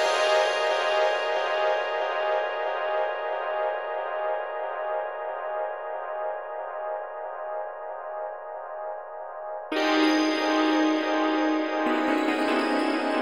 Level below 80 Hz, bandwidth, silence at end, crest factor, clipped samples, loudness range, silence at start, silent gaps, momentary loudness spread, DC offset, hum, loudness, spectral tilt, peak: -76 dBFS; 12 kHz; 0 s; 16 dB; under 0.1%; 10 LU; 0 s; none; 13 LU; 0.2%; none; -27 LUFS; -2 dB/octave; -10 dBFS